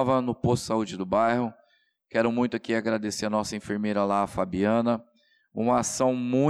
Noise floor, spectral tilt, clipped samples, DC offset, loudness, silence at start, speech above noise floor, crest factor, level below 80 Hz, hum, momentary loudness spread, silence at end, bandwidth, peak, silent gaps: -67 dBFS; -5.5 dB/octave; under 0.1%; under 0.1%; -26 LUFS; 0 s; 42 dB; 14 dB; -58 dBFS; none; 6 LU; 0 s; 13.5 kHz; -12 dBFS; none